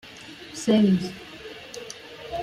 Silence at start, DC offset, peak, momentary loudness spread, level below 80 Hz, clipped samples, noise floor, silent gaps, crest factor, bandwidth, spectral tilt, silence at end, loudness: 0.05 s; under 0.1%; -10 dBFS; 20 LU; -58 dBFS; under 0.1%; -43 dBFS; none; 18 dB; 13 kHz; -6 dB/octave; 0 s; -23 LUFS